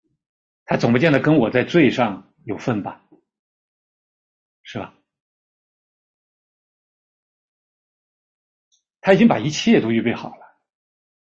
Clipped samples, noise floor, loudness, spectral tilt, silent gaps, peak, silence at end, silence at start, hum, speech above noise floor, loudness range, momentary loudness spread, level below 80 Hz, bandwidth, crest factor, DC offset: under 0.1%; under -90 dBFS; -18 LUFS; -6 dB/octave; 3.39-4.64 s, 5.20-8.71 s; -2 dBFS; 0.95 s; 0.7 s; none; over 73 dB; 22 LU; 19 LU; -58 dBFS; 7.6 kHz; 20 dB; under 0.1%